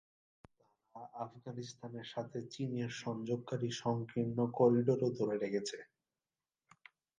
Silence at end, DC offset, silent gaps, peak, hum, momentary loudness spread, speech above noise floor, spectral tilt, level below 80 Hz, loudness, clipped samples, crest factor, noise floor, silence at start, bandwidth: 1.35 s; under 0.1%; none; -18 dBFS; none; 16 LU; over 54 dB; -6.5 dB/octave; -78 dBFS; -37 LUFS; under 0.1%; 20 dB; under -90 dBFS; 0.95 s; 9.6 kHz